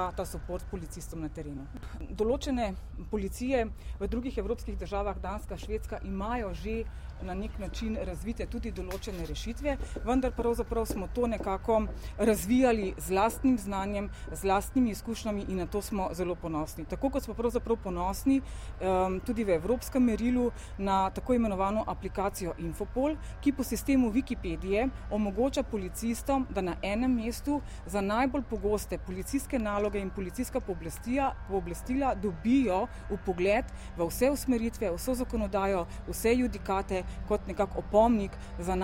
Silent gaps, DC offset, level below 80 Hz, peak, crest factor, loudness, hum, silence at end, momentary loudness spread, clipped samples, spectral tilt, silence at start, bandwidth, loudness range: none; under 0.1%; -40 dBFS; -12 dBFS; 18 dB; -31 LUFS; none; 0 s; 10 LU; under 0.1%; -6 dB/octave; 0 s; 16 kHz; 6 LU